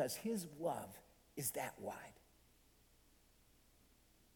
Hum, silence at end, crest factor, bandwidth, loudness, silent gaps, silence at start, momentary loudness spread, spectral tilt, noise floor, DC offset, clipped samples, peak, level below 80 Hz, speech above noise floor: none; 2.15 s; 22 dB; 19 kHz; -44 LUFS; none; 0 s; 14 LU; -4 dB/octave; -71 dBFS; under 0.1%; under 0.1%; -26 dBFS; -74 dBFS; 26 dB